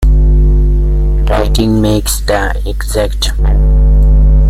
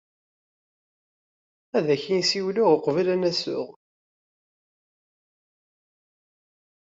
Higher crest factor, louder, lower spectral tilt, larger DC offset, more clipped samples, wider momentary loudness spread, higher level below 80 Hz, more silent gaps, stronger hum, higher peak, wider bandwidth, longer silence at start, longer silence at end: second, 8 dB vs 22 dB; first, -12 LUFS vs -23 LUFS; about the same, -5.5 dB/octave vs -4.5 dB/octave; neither; neither; second, 6 LU vs 9 LU; first, -8 dBFS vs -74 dBFS; neither; first, 50 Hz at -15 dBFS vs none; first, 0 dBFS vs -6 dBFS; first, 14.5 kHz vs 8 kHz; second, 0 s vs 1.75 s; second, 0 s vs 3.1 s